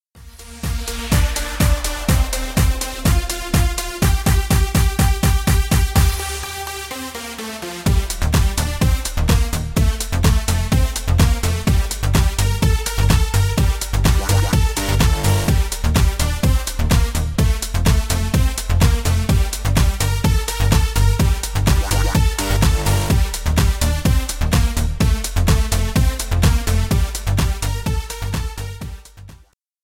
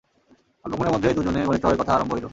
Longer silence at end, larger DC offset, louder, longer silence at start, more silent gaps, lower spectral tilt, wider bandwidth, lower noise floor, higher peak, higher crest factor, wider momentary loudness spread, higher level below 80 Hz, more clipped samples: first, 0.5 s vs 0 s; neither; first, -19 LUFS vs -22 LUFS; second, 0.15 s vs 0.65 s; neither; second, -4.5 dB/octave vs -7 dB/octave; first, 17 kHz vs 7.8 kHz; second, -48 dBFS vs -60 dBFS; about the same, -2 dBFS vs -4 dBFS; about the same, 16 dB vs 18 dB; about the same, 8 LU vs 8 LU; first, -20 dBFS vs -42 dBFS; neither